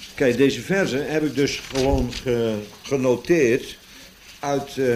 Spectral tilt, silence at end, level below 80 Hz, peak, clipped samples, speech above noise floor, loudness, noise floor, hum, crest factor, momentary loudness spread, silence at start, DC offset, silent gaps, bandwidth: -5 dB/octave; 0 s; -38 dBFS; -6 dBFS; under 0.1%; 24 dB; -22 LUFS; -45 dBFS; none; 16 dB; 8 LU; 0 s; under 0.1%; none; 15.5 kHz